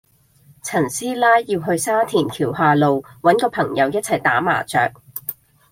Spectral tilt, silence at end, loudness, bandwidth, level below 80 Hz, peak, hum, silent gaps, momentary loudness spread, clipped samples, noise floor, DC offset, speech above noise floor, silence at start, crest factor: -4.5 dB/octave; 0.4 s; -18 LUFS; 16.5 kHz; -58 dBFS; -2 dBFS; none; none; 9 LU; under 0.1%; -53 dBFS; under 0.1%; 35 dB; 0.65 s; 18 dB